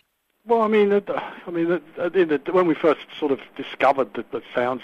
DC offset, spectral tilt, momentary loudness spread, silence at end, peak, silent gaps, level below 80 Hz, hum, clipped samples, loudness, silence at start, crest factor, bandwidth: under 0.1%; -7.5 dB/octave; 10 LU; 0 s; -6 dBFS; none; -68 dBFS; none; under 0.1%; -22 LUFS; 0.45 s; 16 dB; 7.8 kHz